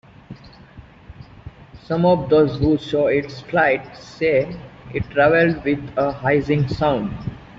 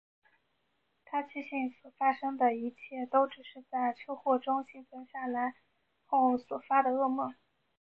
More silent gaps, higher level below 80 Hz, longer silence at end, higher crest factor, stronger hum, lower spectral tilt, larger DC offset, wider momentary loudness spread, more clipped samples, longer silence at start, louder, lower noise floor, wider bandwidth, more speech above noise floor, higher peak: neither; first, -44 dBFS vs -82 dBFS; second, 0.05 s vs 0.5 s; about the same, 16 dB vs 18 dB; neither; second, -5.5 dB/octave vs -7 dB/octave; neither; about the same, 13 LU vs 12 LU; neither; second, 0.3 s vs 1.1 s; first, -19 LUFS vs -32 LUFS; second, -43 dBFS vs -78 dBFS; first, 7.6 kHz vs 5 kHz; second, 25 dB vs 46 dB; first, -4 dBFS vs -14 dBFS